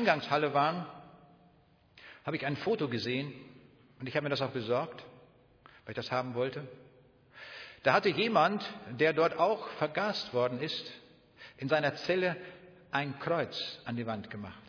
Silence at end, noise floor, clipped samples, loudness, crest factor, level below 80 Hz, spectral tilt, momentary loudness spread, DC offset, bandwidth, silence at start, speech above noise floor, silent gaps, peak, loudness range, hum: 0 s; -65 dBFS; under 0.1%; -32 LUFS; 22 dB; -74 dBFS; -6 dB/octave; 19 LU; under 0.1%; 5.4 kHz; 0 s; 33 dB; none; -10 dBFS; 7 LU; none